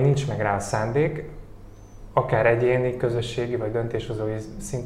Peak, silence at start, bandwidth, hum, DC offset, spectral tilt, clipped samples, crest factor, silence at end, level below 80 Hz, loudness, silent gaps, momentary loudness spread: -6 dBFS; 0 s; 13 kHz; none; under 0.1%; -6.5 dB/octave; under 0.1%; 18 dB; 0 s; -44 dBFS; -24 LUFS; none; 12 LU